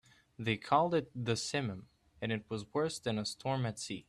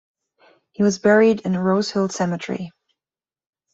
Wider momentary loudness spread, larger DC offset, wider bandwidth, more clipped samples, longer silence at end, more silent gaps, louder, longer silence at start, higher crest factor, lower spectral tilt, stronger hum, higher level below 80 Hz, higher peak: second, 10 LU vs 14 LU; neither; first, 13 kHz vs 7.8 kHz; neither; second, 0.1 s vs 1.05 s; neither; second, -35 LUFS vs -19 LUFS; second, 0.4 s vs 0.8 s; about the same, 20 dB vs 18 dB; about the same, -5 dB/octave vs -5.5 dB/octave; neither; second, -68 dBFS vs -62 dBFS; second, -16 dBFS vs -4 dBFS